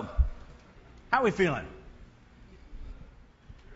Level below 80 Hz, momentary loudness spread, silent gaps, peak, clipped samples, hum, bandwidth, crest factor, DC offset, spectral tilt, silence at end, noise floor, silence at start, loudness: -38 dBFS; 26 LU; none; -10 dBFS; under 0.1%; none; 8 kHz; 24 dB; under 0.1%; -6.5 dB/octave; 0 s; -54 dBFS; 0 s; -29 LUFS